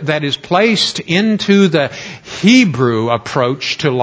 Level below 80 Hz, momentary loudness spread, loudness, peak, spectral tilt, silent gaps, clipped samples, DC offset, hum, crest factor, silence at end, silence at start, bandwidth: -52 dBFS; 7 LU; -13 LUFS; 0 dBFS; -5 dB/octave; none; under 0.1%; under 0.1%; none; 14 dB; 0 s; 0 s; 8 kHz